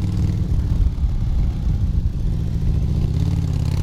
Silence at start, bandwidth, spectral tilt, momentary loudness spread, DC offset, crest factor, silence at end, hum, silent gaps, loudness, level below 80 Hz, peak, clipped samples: 0 s; 10 kHz; -8.5 dB/octave; 3 LU; under 0.1%; 12 dB; 0 s; none; none; -22 LUFS; -22 dBFS; -8 dBFS; under 0.1%